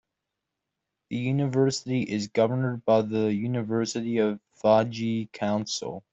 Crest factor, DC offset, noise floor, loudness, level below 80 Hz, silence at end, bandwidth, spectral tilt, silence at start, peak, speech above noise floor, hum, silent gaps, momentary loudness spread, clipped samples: 18 dB; under 0.1%; -84 dBFS; -26 LUFS; -66 dBFS; 0.1 s; 8.2 kHz; -6 dB/octave; 1.1 s; -8 dBFS; 59 dB; none; none; 7 LU; under 0.1%